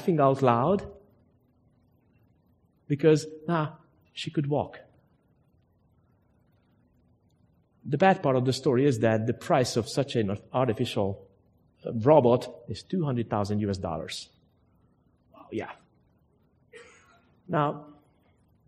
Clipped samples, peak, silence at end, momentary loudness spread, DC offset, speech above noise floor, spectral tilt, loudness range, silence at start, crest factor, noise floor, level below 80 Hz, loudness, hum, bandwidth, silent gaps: under 0.1%; -6 dBFS; 0.75 s; 16 LU; under 0.1%; 40 dB; -6.5 dB/octave; 11 LU; 0 s; 24 dB; -66 dBFS; -62 dBFS; -27 LUFS; none; 13.5 kHz; none